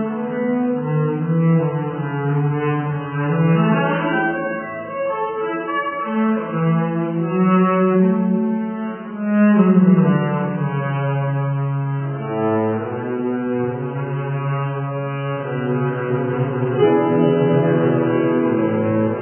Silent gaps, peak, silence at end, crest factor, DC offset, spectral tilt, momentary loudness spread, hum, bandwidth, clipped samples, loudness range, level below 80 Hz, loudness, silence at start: none; -2 dBFS; 0 s; 16 dB; under 0.1%; -12.5 dB/octave; 9 LU; none; 3.3 kHz; under 0.1%; 6 LU; -60 dBFS; -19 LUFS; 0 s